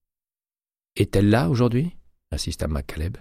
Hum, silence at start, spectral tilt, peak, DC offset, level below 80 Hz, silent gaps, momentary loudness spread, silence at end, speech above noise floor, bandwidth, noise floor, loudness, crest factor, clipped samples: none; 0.95 s; -6.5 dB/octave; -6 dBFS; under 0.1%; -36 dBFS; none; 12 LU; 0 s; over 69 dB; 15.5 kHz; under -90 dBFS; -23 LUFS; 16 dB; under 0.1%